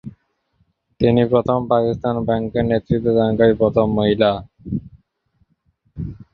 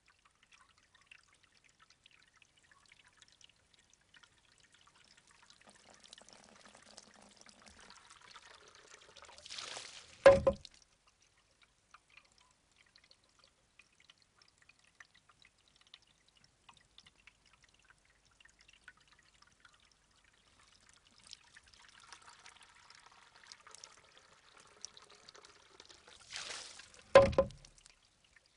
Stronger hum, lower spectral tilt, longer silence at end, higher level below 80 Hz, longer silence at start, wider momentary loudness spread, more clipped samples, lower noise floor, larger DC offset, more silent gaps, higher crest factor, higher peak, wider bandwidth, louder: neither; first, -10 dB/octave vs -4.5 dB/octave; second, 0.2 s vs 1.1 s; first, -42 dBFS vs -64 dBFS; second, 0.05 s vs 9.55 s; second, 13 LU vs 34 LU; neither; second, -65 dBFS vs -72 dBFS; neither; neither; second, 18 dB vs 32 dB; first, -2 dBFS vs -8 dBFS; second, 5.4 kHz vs 10.5 kHz; first, -18 LUFS vs -31 LUFS